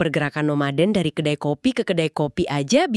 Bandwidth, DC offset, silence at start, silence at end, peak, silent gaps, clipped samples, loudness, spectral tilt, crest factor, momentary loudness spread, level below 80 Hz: 12 kHz; under 0.1%; 0 s; 0 s; -6 dBFS; none; under 0.1%; -21 LUFS; -5.5 dB/octave; 16 dB; 4 LU; -54 dBFS